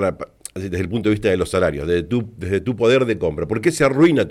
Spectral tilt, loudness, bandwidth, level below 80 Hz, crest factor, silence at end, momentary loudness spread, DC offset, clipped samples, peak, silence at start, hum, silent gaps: -6 dB/octave; -19 LUFS; 13.5 kHz; -42 dBFS; 14 dB; 0 s; 10 LU; under 0.1%; under 0.1%; -6 dBFS; 0 s; none; none